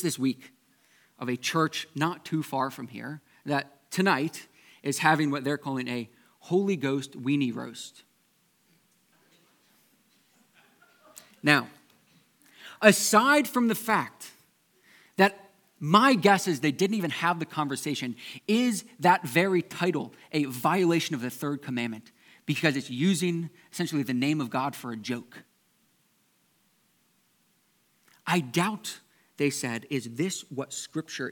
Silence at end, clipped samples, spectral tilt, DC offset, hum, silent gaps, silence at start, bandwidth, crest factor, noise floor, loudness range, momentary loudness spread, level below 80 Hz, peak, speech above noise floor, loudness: 0 s; under 0.1%; -4.5 dB/octave; under 0.1%; none; none; 0 s; 19 kHz; 28 dB; -69 dBFS; 9 LU; 16 LU; -82 dBFS; -2 dBFS; 42 dB; -27 LUFS